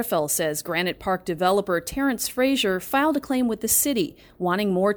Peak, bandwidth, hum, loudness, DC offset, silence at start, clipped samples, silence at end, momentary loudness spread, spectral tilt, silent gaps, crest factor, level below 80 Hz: -8 dBFS; over 20 kHz; none; -23 LUFS; under 0.1%; 0 s; under 0.1%; 0 s; 6 LU; -3.5 dB/octave; none; 16 dB; -52 dBFS